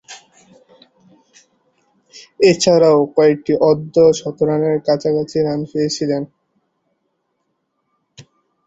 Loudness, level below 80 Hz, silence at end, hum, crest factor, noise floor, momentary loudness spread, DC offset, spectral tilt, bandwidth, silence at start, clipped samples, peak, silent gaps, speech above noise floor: -15 LUFS; -58 dBFS; 0.45 s; none; 16 dB; -70 dBFS; 8 LU; under 0.1%; -5.5 dB/octave; 8 kHz; 0.1 s; under 0.1%; -2 dBFS; none; 56 dB